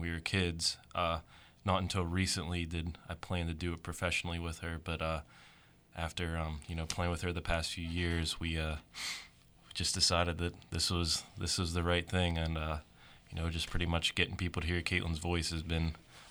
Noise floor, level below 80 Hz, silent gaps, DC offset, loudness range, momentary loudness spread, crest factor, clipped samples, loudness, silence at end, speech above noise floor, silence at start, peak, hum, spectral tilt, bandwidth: -62 dBFS; -46 dBFS; none; under 0.1%; 5 LU; 9 LU; 22 dB; under 0.1%; -35 LUFS; 0 s; 26 dB; 0 s; -14 dBFS; none; -4 dB/octave; over 20 kHz